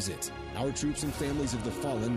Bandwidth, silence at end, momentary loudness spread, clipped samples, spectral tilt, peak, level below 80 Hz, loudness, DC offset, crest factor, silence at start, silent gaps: 15.5 kHz; 0 s; 4 LU; under 0.1%; -4.5 dB/octave; -20 dBFS; -46 dBFS; -33 LUFS; under 0.1%; 12 dB; 0 s; none